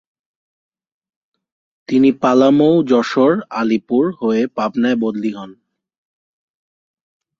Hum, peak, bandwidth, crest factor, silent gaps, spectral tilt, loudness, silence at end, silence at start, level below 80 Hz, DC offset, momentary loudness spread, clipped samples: none; -2 dBFS; 7.4 kHz; 16 dB; none; -7 dB/octave; -15 LUFS; 1.85 s; 1.9 s; -62 dBFS; under 0.1%; 8 LU; under 0.1%